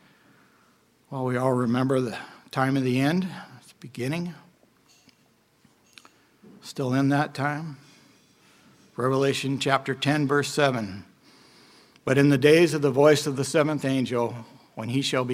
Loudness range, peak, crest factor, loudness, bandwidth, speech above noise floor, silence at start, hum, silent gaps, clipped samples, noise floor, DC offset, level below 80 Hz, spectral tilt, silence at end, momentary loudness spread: 9 LU; -4 dBFS; 22 dB; -24 LUFS; 16 kHz; 40 dB; 1.1 s; none; none; under 0.1%; -63 dBFS; under 0.1%; -68 dBFS; -5.5 dB/octave; 0 s; 19 LU